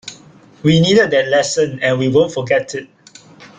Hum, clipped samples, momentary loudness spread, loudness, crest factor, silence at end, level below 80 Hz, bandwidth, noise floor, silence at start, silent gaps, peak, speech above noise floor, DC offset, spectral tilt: none; under 0.1%; 12 LU; -14 LUFS; 14 dB; 0.1 s; -52 dBFS; 9.6 kHz; -44 dBFS; 0.05 s; none; -2 dBFS; 30 dB; under 0.1%; -5 dB/octave